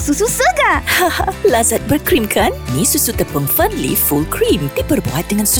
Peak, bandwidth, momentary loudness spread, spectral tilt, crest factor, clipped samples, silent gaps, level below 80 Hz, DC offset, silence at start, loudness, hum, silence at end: -2 dBFS; 19.5 kHz; 5 LU; -3.5 dB/octave; 12 dB; under 0.1%; none; -30 dBFS; under 0.1%; 0 s; -14 LUFS; none; 0 s